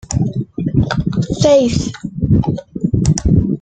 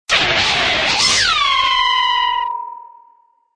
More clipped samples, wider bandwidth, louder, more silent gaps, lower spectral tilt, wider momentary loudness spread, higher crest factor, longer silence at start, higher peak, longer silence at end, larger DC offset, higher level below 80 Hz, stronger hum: neither; second, 9.2 kHz vs 11 kHz; about the same, -16 LUFS vs -14 LUFS; neither; first, -6.5 dB/octave vs -0.5 dB/octave; about the same, 10 LU vs 10 LU; about the same, 14 dB vs 14 dB; about the same, 0.1 s vs 0.1 s; about the same, -2 dBFS vs -2 dBFS; second, 0.05 s vs 0.65 s; neither; first, -28 dBFS vs -44 dBFS; neither